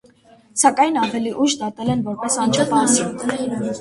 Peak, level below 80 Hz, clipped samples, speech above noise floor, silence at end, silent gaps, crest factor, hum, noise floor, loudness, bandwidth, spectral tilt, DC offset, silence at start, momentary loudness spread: -2 dBFS; -56 dBFS; under 0.1%; 32 dB; 0 s; none; 18 dB; none; -51 dBFS; -19 LUFS; 11.5 kHz; -3.5 dB/octave; under 0.1%; 0.55 s; 8 LU